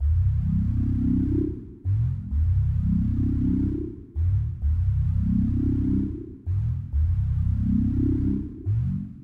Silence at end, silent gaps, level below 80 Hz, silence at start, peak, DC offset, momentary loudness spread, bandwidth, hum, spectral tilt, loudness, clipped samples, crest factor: 0 s; none; -30 dBFS; 0 s; -14 dBFS; under 0.1%; 5 LU; 2.5 kHz; none; -12 dB/octave; -25 LUFS; under 0.1%; 10 dB